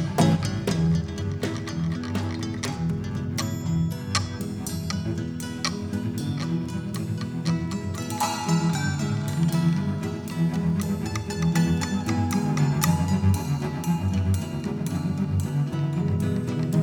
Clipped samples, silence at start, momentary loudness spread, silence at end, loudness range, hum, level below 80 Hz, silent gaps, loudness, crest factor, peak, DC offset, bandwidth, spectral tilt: under 0.1%; 0 s; 7 LU; 0 s; 4 LU; none; -46 dBFS; none; -26 LUFS; 22 dB; -4 dBFS; under 0.1%; 19 kHz; -6 dB/octave